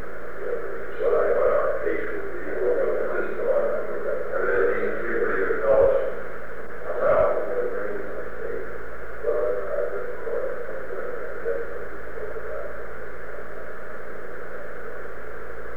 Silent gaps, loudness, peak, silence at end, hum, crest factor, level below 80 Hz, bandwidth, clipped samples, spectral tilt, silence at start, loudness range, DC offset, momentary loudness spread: none; -26 LUFS; -8 dBFS; 0 s; none; 18 dB; -48 dBFS; 19.5 kHz; under 0.1%; -7.5 dB/octave; 0 s; 11 LU; 6%; 16 LU